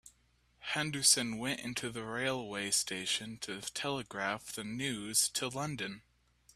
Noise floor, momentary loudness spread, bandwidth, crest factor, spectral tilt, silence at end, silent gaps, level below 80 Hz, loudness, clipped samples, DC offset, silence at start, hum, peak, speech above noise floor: -71 dBFS; 13 LU; 15.5 kHz; 24 dB; -2 dB/octave; 0.55 s; none; -70 dBFS; -34 LUFS; under 0.1%; under 0.1%; 0.05 s; none; -12 dBFS; 35 dB